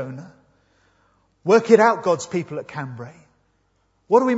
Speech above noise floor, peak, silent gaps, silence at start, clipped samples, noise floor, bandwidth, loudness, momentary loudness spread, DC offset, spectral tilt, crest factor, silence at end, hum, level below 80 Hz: 47 dB; 0 dBFS; none; 0 s; under 0.1%; -66 dBFS; 8 kHz; -19 LUFS; 22 LU; under 0.1%; -6 dB/octave; 22 dB; 0 s; none; -68 dBFS